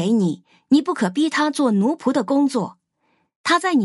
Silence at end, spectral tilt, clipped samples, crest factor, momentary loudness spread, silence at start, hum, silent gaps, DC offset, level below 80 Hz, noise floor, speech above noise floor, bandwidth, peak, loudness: 0 s; -5.5 dB/octave; under 0.1%; 14 dB; 8 LU; 0 s; none; 3.36-3.44 s; under 0.1%; -70 dBFS; -67 dBFS; 49 dB; 11.5 kHz; -6 dBFS; -20 LUFS